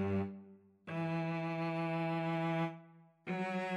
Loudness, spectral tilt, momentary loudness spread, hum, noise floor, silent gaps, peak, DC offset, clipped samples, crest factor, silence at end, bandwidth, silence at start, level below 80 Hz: -38 LUFS; -8 dB/octave; 15 LU; none; -60 dBFS; none; -26 dBFS; under 0.1%; under 0.1%; 12 dB; 0 s; 8.4 kHz; 0 s; -82 dBFS